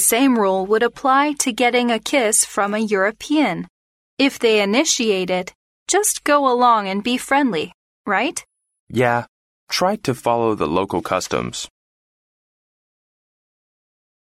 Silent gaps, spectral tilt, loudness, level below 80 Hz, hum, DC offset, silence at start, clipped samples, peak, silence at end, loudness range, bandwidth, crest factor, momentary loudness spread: 3.70-4.17 s, 5.55-5.86 s, 7.74-8.05 s, 8.80-8.87 s, 9.29-9.67 s; -3 dB/octave; -18 LUFS; -56 dBFS; none; under 0.1%; 0 s; under 0.1%; -2 dBFS; 2.7 s; 6 LU; 16 kHz; 16 dB; 10 LU